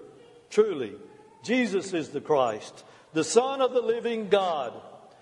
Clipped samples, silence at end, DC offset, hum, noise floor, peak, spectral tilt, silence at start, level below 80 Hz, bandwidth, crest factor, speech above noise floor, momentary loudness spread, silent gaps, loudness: under 0.1%; 0.25 s; under 0.1%; none; -51 dBFS; -6 dBFS; -4 dB/octave; 0 s; -78 dBFS; 11 kHz; 22 dB; 25 dB; 14 LU; none; -27 LUFS